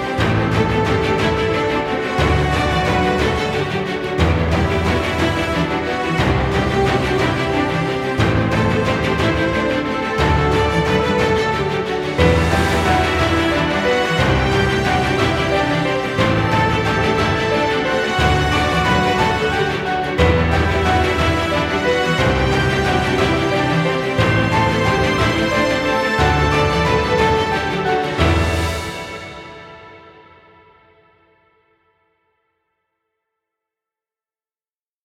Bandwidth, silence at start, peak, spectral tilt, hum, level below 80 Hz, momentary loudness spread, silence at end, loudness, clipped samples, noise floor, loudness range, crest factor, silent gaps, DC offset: 15.5 kHz; 0 s; 0 dBFS; -5.5 dB/octave; none; -30 dBFS; 4 LU; 4.95 s; -17 LUFS; under 0.1%; under -90 dBFS; 2 LU; 16 dB; none; under 0.1%